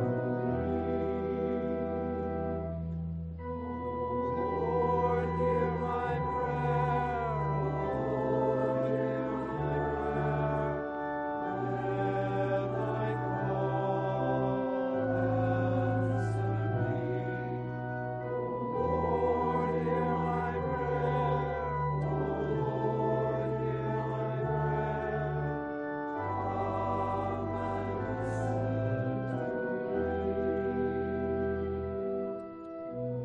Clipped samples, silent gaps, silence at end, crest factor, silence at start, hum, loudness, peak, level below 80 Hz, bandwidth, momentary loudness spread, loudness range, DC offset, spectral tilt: under 0.1%; none; 0 s; 14 dB; 0 s; none; -32 LUFS; -16 dBFS; -50 dBFS; 8.8 kHz; 6 LU; 3 LU; under 0.1%; -9.5 dB/octave